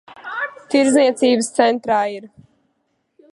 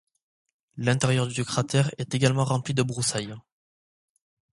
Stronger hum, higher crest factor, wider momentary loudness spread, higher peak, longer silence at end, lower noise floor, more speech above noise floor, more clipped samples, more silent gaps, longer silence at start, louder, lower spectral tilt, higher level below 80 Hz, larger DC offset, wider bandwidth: neither; about the same, 18 dB vs 22 dB; first, 12 LU vs 7 LU; first, 0 dBFS vs -6 dBFS; about the same, 1.05 s vs 1.15 s; second, -69 dBFS vs under -90 dBFS; second, 53 dB vs over 65 dB; neither; neither; second, 0.1 s vs 0.75 s; first, -17 LUFS vs -25 LUFS; second, -3 dB/octave vs -5 dB/octave; about the same, -64 dBFS vs -60 dBFS; neither; about the same, 11.5 kHz vs 11.5 kHz